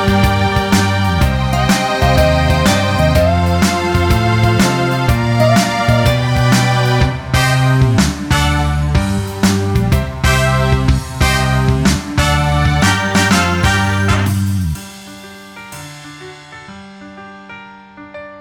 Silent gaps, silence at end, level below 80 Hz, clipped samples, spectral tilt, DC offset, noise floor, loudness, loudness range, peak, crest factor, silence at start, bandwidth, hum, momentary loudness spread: none; 0 s; -22 dBFS; under 0.1%; -5.5 dB/octave; under 0.1%; -36 dBFS; -13 LUFS; 8 LU; 0 dBFS; 14 dB; 0 s; 18 kHz; none; 20 LU